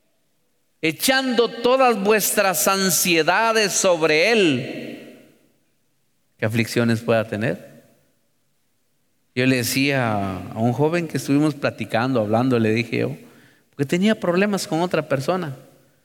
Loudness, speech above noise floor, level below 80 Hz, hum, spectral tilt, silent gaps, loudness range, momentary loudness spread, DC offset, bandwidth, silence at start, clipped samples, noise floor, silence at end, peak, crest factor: -20 LUFS; 50 dB; -64 dBFS; none; -4 dB/octave; none; 8 LU; 11 LU; under 0.1%; 19.5 kHz; 0.85 s; under 0.1%; -70 dBFS; 0.45 s; -6 dBFS; 16 dB